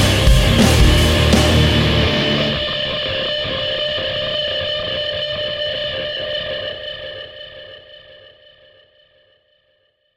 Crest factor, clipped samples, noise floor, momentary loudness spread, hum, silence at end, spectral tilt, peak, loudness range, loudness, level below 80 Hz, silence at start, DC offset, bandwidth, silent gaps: 18 dB; under 0.1%; -62 dBFS; 16 LU; none; 2 s; -4.5 dB/octave; 0 dBFS; 16 LU; -16 LUFS; -24 dBFS; 0 s; under 0.1%; 16.5 kHz; none